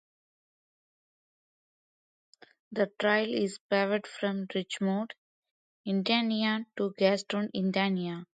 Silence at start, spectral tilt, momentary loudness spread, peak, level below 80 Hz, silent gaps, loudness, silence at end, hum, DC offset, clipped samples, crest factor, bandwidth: 2.7 s; -5.5 dB/octave; 8 LU; -12 dBFS; -78 dBFS; 3.61-3.69 s, 5.18-5.43 s, 5.51-5.84 s; -30 LUFS; 0.15 s; none; under 0.1%; under 0.1%; 20 dB; 9.2 kHz